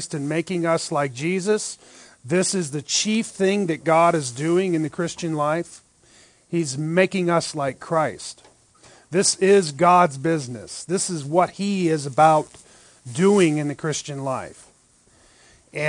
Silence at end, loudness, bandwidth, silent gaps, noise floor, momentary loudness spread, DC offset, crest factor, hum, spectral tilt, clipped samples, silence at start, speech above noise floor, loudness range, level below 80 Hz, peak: 0 s; -21 LUFS; 10.5 kHz; none; -57 dBFS; 12 LU; under 0.1%; 20 dB; none; -4.5 dB/octave; under 0.1%; 0 s; 36 dB; 4 LU; -66 dBFS; -4 dBFS